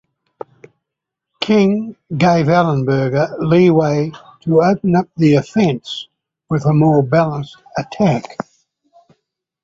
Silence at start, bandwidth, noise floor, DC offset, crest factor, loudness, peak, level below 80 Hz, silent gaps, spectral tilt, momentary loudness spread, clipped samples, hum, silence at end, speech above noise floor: 1.4 s; 7.6 kHz; -81 dBFS; under 0.1%; 14 dB; -15 LUFS; -2 dBFS; -52 dBFS; none; -7.5 dB/octave; 15 LU; under 0.1%; none; 1.3 s; 66 dB